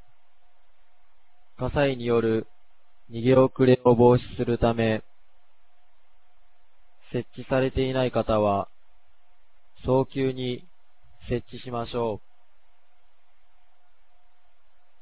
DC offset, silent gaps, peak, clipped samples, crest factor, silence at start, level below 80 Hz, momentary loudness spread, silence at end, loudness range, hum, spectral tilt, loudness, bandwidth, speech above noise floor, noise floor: 0.8%; none; -6 dBFS; under 0.1%; 22 dB; 1.6 s; -46 dBFS; 15 LU; 2.85 s; 13 LU; none; -11 dB/octave; -24 LUFS; 4 kHz; 43 dB; -67 dBFS